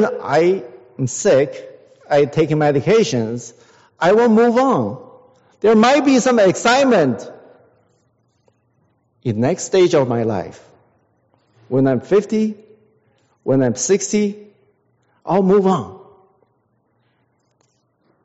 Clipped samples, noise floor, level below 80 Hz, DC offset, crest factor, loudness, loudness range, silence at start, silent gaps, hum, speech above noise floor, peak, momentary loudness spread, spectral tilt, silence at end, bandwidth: under 0.1%; -64 dBFS; -58 dBFS; under 0.1%; 16 dB; -16 LUFS; 6 LU; 0 s; none; none; 49 dB; -2 dBFS; 16 LU; -5.5 dB/octave; 2.3 s; 8 kHz